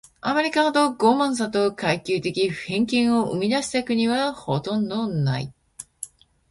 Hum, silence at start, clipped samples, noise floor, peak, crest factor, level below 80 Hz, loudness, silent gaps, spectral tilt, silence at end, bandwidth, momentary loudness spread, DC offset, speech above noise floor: none; 0.25 s; under 0.1%; -42 dBFS; -4 dBFS; 18 dB; -58 dBFS; -22 LUFS; none; -5 dB/octave; 0.45 s; 11.5 kHz; 17 LU; under 0.1%; 20 dB